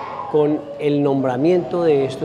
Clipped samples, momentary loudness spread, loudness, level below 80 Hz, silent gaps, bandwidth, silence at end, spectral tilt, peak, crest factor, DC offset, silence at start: under 0.1%; 4 LU; -18 LUFS; -58 dBFS; none; 10 kHz; 0 s; -8 dB/octave; -6 dBFS; 12 dB; under 0.1%; 0 s